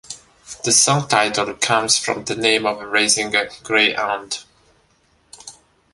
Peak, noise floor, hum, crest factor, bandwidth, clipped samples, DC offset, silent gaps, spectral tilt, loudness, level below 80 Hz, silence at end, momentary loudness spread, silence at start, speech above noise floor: -2 dBFS; -59 dBFS; none; 20 dB; 12 kHz; under 0.1%; under 0.1%; none; -1.5 dB/octave; -17 LUFS; -58 dBFS; 0.4 s; 18 LU; 0.1 s; 41 dB